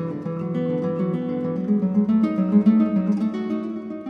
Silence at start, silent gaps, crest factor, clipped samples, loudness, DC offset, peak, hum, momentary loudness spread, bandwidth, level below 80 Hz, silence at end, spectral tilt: 0 s; none; 16 dB; under 0.1%; -22 LUFS; under 0.1%; -6 dBFS; none; 9 LU; 5 kHz; -62 dBFS; 0 s; -10.5 dB/octave